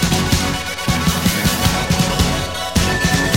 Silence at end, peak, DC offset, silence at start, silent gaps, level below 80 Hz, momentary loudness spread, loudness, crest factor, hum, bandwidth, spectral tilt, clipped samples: 0 s; -2 dBFS; under 0.1%; 0 s; none; -28 dBFS; 4 LU; -17 LUFS; 14 dB; none; 16.5 kHz; -4 dB/octave; under 0.1%